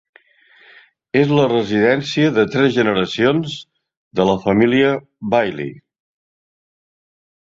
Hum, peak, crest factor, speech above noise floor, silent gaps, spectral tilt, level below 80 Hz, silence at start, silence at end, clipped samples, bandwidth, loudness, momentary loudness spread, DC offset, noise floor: none; -2 dBFS; 18 dB; 36 dB; 3.97-4.11 s; -6.5 dB/octave; -54 dBFS; 1.15 s; 1.75 s; under 0.1%; 7.8 kHz; -16 LUFS; 11 LU; under 0.1%; -52 dBFS